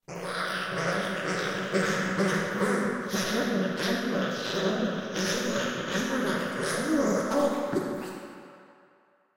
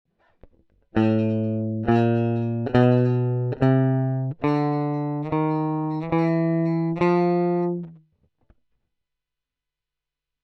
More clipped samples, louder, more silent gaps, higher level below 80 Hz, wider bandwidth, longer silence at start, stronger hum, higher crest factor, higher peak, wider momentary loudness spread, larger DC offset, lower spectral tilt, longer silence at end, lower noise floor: neither; second, -28 LUFS vs -22 LUFS; neither; second, -64 dBFS vs -54 dBFS; first, 16 kHz vs 6 kHz; second, 0.1 s vs 0.95 s; neither; about the same, 16 dB vs 18 dB; second, -14 dBFS vs -4 dBFS; about the same, 5 LU vs 6 LU; first, 0.1% vs under 0.1%; second, -4.5 dB/octave vs -10 dB/octave; second, 0.65 s vs 2.5 s; second, -64 dBFS vs -86 dBFS